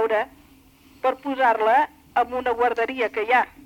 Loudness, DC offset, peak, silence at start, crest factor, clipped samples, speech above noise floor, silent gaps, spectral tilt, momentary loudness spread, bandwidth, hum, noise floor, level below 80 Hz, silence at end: -22 LUFS; under 0.1%; -8 dBFS; 0 s; 14 dB; under 0.1%; 31 dB; none; -4 dB/octave; 6 LU; 17 kHz; none; -53 dBFS; -58 dBFS; 0.2 s